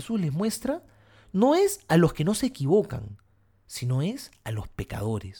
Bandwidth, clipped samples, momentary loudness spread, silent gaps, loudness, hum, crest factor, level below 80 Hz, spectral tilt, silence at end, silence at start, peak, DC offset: 19 kHz; under 0.1%; 14 LU; none; -26 LUFS; none; 18 dB; -50 dBFS; -6 dB/octave; 0 s; 0 s; -8 dBFS; under 0.1%